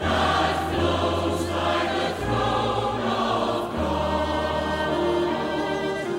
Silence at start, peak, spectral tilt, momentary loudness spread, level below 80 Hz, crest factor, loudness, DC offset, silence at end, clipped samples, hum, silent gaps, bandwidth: 0 s; -10 dBFS; -5.5 dB/octave; 3 LU; -40 dBFS; 14 dB; -24 LUFS; under 0.1%; 0 s; under 0.1%; none; none; 16 kHz